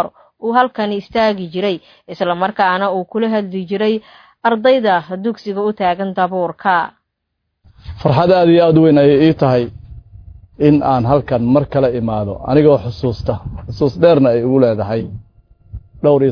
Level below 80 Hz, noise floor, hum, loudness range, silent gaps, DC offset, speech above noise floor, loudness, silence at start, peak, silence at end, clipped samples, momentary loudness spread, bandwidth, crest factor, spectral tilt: -40 dBFS; -73 dBFS; none; 5 LU; none; under 0.1%; 59 dB; -15 LUFS; 0 s; 0 dBFS; 0 s; under 0.1%; 12 LU; 5.4 kHz; 14 dB; -9 dB/octave